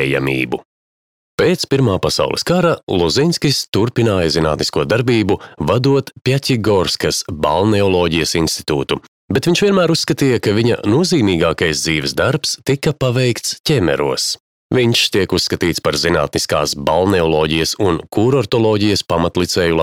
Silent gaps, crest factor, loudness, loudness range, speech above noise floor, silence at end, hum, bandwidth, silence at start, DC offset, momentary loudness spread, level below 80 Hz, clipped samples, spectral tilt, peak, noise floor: 0.65-1.38 s, 2.83-2.87 s, 3.68-3.72 s, 9.08-9.28 s, 13.60-13.64 s, 14.40-14.70 s; 14 dB; -15 LUFS; 1 LU; over 75 dB; 0 s; none; 16.5 kHz; 0 s; under 0.1%; 4 LU; -40 dBFS; under 0.1%; -4.5 dB/octave; -2 dBFS; under -90 dBFS